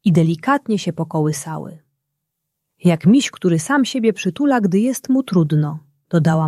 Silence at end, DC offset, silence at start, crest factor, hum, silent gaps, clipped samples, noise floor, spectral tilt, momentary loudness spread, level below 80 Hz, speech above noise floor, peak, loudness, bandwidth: 0 s; under 0.1%; 0.05 s; 14 dB; none; none; under 0.1%; -77 dBFS; -6.5 dB/octave; 9 LU; -60 dBFS; 61 dB; -2 dBFS; -18 LUFS; 13 kHz